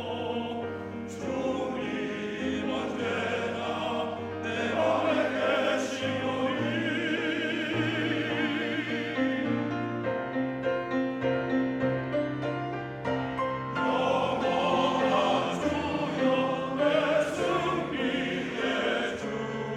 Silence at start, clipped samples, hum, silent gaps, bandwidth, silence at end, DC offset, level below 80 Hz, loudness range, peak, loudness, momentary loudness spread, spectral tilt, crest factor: 0 s; under 0.1%; none; none; 11.5 kHz; 0 s; under 0.1%; -62 dBFS; 4 LU; -12 dBFS; -29 LUFS; 7 LU; -5.5 dB/octave; 16 dB